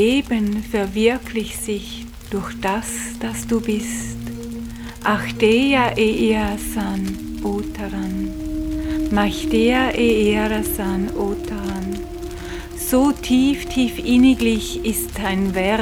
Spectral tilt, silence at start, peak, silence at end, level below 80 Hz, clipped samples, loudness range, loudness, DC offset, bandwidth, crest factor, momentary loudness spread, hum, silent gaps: -5 dB/octave; 0 s; -2 dBFS; 0 s; -34 dBFS; under 0.1%; 5 LU; -20 LUFS; under 0.1%; 19.5 kHz; 18 dB; 12 LU; none; none